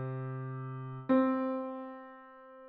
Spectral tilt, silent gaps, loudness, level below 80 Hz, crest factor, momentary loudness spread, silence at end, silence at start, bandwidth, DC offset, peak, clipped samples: -8.5 dB/octave; none; -34 LUFS; -76 dBFS; 18 dB; 22 LU; 0 s; 0 s; 4.3 kHz; under 0.1%; -16 dBFS; under 0.1%